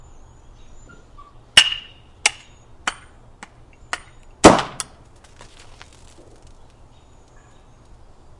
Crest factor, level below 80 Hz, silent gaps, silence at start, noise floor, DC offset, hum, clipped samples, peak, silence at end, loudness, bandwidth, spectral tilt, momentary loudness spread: 24 dB; -44 dBFS; none; 1.55 s; -48 dBFS; under 0.1%; none; under 0.1%; 0 dBFS; 3.7 s; -18 LUFS; 12 kHz; -2.5 dB/octave; 19 LU